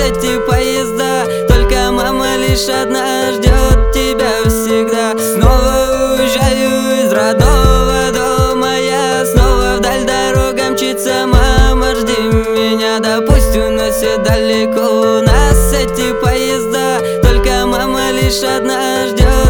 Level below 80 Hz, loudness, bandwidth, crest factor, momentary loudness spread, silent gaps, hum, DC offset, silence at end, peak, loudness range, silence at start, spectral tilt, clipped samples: -16 dBFS; -12 LUFS; over 20 kHz; 10 dB; 4 LU; none; none; under 0.1%; 0 s; 0 dBFS; 1 LU; 0 s; -4.5 dB/octave; 0.2%